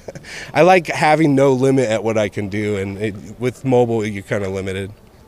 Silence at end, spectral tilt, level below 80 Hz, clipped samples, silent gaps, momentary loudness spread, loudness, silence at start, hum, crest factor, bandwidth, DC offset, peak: 0.35 s; -6 dB/octave; -50 dBFS; under 0.1%; none; 13 LU; -17 LUFS; 0.1 s; none; 16 dB; 15 kHz; under 0.1%; -2 dBFS